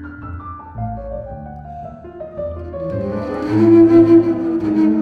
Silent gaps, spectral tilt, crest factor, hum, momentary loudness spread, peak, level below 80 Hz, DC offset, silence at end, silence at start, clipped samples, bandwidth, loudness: none; -10 dB/octave; 14 dB; none; 23 LU; -2 dBFS; -40 dBFS; under 0.1%; 0 s; 0 s; under 0.1%; 4.9 kHz; -14 LUFS